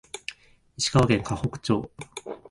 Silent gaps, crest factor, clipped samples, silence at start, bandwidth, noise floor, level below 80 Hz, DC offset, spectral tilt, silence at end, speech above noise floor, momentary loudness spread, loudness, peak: none; 20 dB; under 0.1%; 0.15 s; 11.5 kHz; -51 dBFS; -46 dBFS; under 0.1%; -5 dB/octave; 0.15 s; 25 dB; 17 LU; -25 LUFS; -6 dBFS